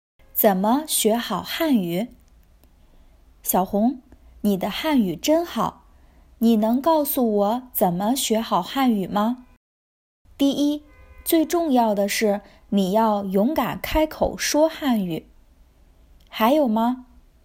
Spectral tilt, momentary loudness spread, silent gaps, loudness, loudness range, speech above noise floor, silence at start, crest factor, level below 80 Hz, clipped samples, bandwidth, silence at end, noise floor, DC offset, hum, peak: -4.5 dB/octave; 8 LU; 9.57-10.25 s; -22 LUFS; 3 LU; 33 dB; 0.35 s; 18 dB; -46 dBFS; under 0.1%; 16.5 kHz; 0.45 s; -53 dBFS; under 0.1%; none; -4 dBFS